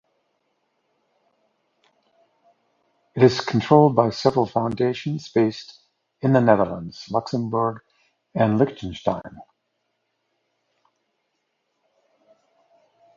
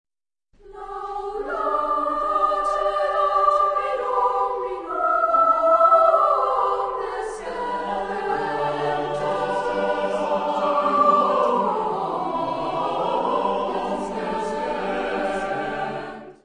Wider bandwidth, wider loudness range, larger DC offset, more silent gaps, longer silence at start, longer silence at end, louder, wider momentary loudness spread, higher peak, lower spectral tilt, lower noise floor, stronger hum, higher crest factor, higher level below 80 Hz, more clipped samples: second, 7.6 kHz vs 10.5 kHz; about the same, 7 LU vs 6 LU; neither; neither; first, 3.15 s vs 0.65 s; first, 3.75 s vs 0.1 s; about the same, -21 LUFS vs -22 LUFS; first, 16 LU vs 11 LU; first, 0 dBFS vs -4 dBFS; first, -7.5 dB/octave vs -5.5 dB/octave; first, -75 dBFS vs -67 dBFS; neither; first, 24 dB vs 18 dB; second, -56 dBFS vs -50 dBFS; neither